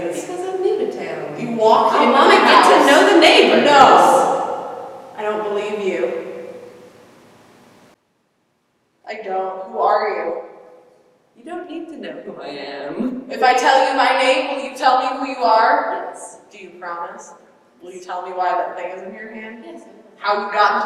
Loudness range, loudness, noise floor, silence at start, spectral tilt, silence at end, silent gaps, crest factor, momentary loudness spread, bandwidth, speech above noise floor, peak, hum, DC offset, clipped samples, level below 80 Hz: 16 LU; -15 LUFS; -65 dBFS; 0 s; -3 dB/octave; 0 s; none; 18 dB; 22 LU; 15.5 kHz; 52 dB; 0 dBFS; none; under 0.1%; under 0.1%; -64 dBFS